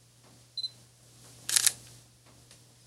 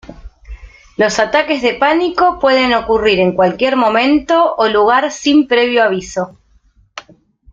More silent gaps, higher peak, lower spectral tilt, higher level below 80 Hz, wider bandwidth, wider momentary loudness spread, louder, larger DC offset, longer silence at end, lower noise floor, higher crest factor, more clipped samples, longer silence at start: neither; about the same, 0 dBFS vs 0 dBFS; second, 1.5 dB/octave vs -4.5 dB/octave; second, -72 dBFS vs -42 dBFS; first, 16 kHz vs 7.8 kHz; first, 17 LU vs 12 LU; second, -29 LUFS vs -13 LUFS; neither; first, 0.95 s vs 0.5 s; first, -58 dBFS vs -52 dBFS; first, 36 dB vs 14 dB; neither; first, 0.55 s vs 0.1 s